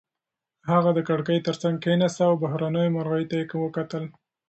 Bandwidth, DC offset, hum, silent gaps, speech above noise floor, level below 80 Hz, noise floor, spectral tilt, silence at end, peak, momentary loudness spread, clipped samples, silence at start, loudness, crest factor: 8.2 kHz; under 0.1%; none; none; 64 dB; -66 dBFS; -87 dBFS; -7 dB/octave; 0.4 s; -6 dBFS; 10 LU; under 0.1%; 0.65 s; -24 LUFS; 18 dB